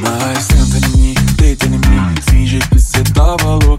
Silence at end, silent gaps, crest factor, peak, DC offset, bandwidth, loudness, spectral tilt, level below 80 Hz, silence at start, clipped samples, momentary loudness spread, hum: 0 s; none; 10 dB; 0 dBFS; under 0.1%; 16 kHz; -12 LUFS; -5 dB/octave; -12 dBFS; 0 s; under 0.1%; 2 LU; none